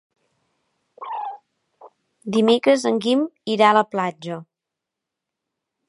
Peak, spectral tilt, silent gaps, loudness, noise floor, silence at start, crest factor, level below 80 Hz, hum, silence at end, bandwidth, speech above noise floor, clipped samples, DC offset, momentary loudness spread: -2 dBFS; -5 dB/octave; none; -19 LUFS; -85 dBFS; 1 s; 20 dB; -76 dBFS; none; 1.45 s; 11.5 kHz; 66 dB; under 0.1%; under 0.1%; 18 LU